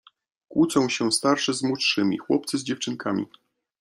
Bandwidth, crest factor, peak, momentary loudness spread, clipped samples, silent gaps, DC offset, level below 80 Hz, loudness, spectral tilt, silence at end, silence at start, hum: 13.5 kHz; 18 dB; -6 dBFS; 8 LU; under 0.1%; none; under 0.1%; -66 dBFS; -24 LUFS; -3.5 dB/octave; 0.55 s; 0.5 s; none